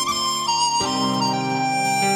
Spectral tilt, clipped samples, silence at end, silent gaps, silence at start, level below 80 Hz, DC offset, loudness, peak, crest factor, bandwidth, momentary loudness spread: -2.5 dB/octave; under 0.1%; 0 s; none; 0 s; -56 dBFS; under 0.1%; -20 LUFS; -8 dBFS; 12 dB; 18 kHz; 3 LU